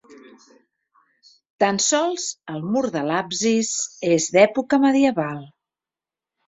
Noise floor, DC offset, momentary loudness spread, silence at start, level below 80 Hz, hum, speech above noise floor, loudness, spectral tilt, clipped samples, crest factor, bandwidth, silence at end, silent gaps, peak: -90 dBFS; under 0.1%; 11 LU; 0.1 s; -66 dBFS; none; 70 dB; -20 LUFS; -3.5 dB/octave; under 0.1%; 20 dB; 8 kHz; 1 s; 1.50-1.59 s; -2 dBFS